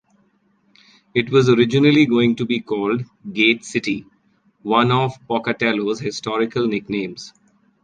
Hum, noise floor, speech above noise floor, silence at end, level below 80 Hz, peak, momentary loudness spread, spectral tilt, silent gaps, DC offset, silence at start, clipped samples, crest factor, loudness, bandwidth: none; -61 dBFS; 43 dB; 0.55 s; -58 dBFS; -2 dBFS; 11 LU; -6 dB/octave; none; under 0.1%; 1.15 s; under 0.1%; 18 dB; -19 LUFS; 9.4 kHz